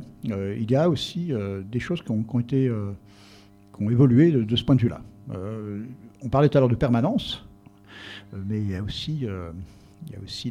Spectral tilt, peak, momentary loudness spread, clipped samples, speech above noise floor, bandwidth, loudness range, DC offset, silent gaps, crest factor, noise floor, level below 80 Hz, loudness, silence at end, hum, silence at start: -8 dB/octave; -6 dBFS; 21 LU; under 0.1%; 25 dB; 10.5 kHz; 6 LU; under 0.1%; none; 18 dB; -49 dBFS; -48 dBFS; -24 LUFS; 0 s; 50 Hz at -50 dBFS; 0 s